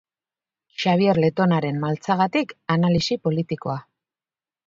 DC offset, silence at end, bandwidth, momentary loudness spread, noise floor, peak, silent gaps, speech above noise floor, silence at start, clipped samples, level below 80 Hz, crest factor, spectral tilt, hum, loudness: under 0.1%; 0.85 s; 7.6 kHz; 9 LU; under -90 dBFS; -4 dBFS; none; over 69 dB; 0.8 s; under 0.1%; -54 dBFS; 18 dB; -7 dB/octave; none; -22 LUFS